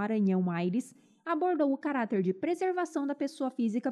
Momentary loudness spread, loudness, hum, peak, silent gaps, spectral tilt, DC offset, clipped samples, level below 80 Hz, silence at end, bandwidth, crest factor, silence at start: 6 LU; -31 LUFS; none; -16 dBFS; none; -7.5 dB/octave; under 0.1%; under 0.1%; -86 dBFS; 0 s; 12 kHz; 14 dB; 0 s